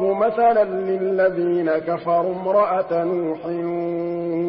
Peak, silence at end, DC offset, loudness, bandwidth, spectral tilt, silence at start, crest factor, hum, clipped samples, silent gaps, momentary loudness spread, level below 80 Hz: -8 dBFS; 0 s; under 0.1%; -21 LUFS; 5.4 kHz; -12 dB/octave; 0 s; 12 dB; none; under 0.1%; none; 7 LU; -62 dBFS